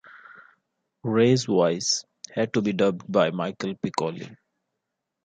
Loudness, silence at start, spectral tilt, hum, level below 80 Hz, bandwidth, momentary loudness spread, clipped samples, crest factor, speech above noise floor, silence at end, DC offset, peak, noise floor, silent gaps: -24 LUFS; 0.15 s; -5 dB/octave; none; -66 dBFS; 9.4 kHz; 13 LU; under 0.1%; 18 dB; 59 dB; 0.9 s; under 0.1%; -6 dBFS; -82 dBFS; none